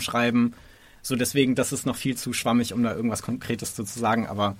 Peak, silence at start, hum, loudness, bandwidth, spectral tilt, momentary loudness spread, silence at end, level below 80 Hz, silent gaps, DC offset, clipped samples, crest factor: -8 dBFS; 0 s; none; -25 LUFS; 16.5 kHz; -4.5 dB/octave; 8 LU; 0 s; -56 dBFS; none; under 0.1%; under 0.1%; 18 dB